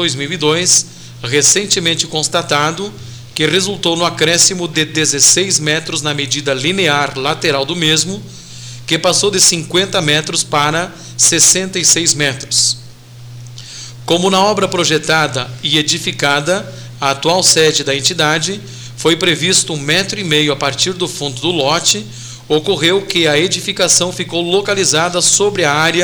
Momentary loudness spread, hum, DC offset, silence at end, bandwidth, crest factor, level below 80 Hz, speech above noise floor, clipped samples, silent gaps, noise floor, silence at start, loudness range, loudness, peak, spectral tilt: 11 LU; none; 0.2%; 0 s; over 20 kHz; 14 dB; -48 dBFS; 20 dB; under 0.1%; none; -34 dBFS; 0 s; 3 LU; -12 LUFS; 0 dBFS; -2 dB/octave